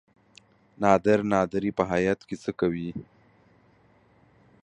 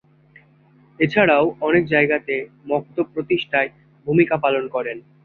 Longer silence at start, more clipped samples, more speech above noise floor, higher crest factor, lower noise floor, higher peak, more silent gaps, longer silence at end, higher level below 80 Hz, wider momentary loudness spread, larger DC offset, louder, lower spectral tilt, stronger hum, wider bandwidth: second, 0.8 s vs 1 s; neither; about the same, 36 dB vs 34 dB; first, 24 dB vs 18 dB; first, -60 dBFS vs -53 dBFS; about the same, -4 dBFS vs -2 dBFS; neither; first, 1.6 s vs 0.25 s; about the same, -56 dBFS vs -58 dBFS; first, 13 LU vs 10 LU; neither; second, -25 LUFS vs -20 LUFS; second, -7 dB/octave vs -8.5 dB/octave; neither; first, 9.4 kHz vs 4.7 kHz